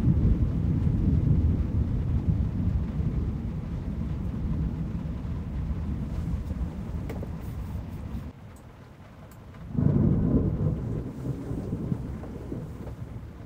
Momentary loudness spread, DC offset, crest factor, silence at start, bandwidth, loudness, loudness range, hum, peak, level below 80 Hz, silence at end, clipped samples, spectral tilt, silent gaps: 16 LU; under 0.1%; 18 dB; 0 s; 8.4 kHz; -29 LUFS; 8 LU; none; -10 dBFS; -34 dBFS; 0 s; under 0.1%; -10 dB/octave; none